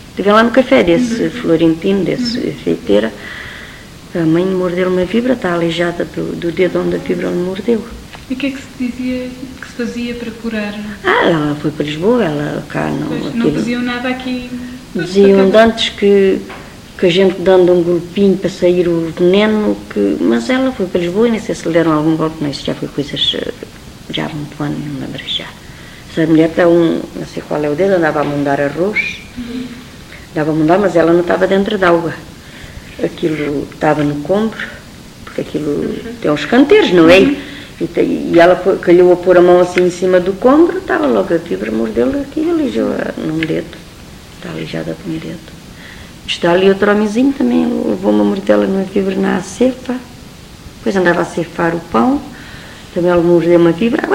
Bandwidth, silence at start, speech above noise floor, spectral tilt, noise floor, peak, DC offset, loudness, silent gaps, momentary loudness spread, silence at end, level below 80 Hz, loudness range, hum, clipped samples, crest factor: 16 kHz; 0 s; 21 dB; -6 dB/octave; -34 dBFS; 0 dBFS; under 0.1%; -13 LUFS; none; 17 LU; 0 s; -40 dBFS; 8 LU; none; under 0.1%; 14 dB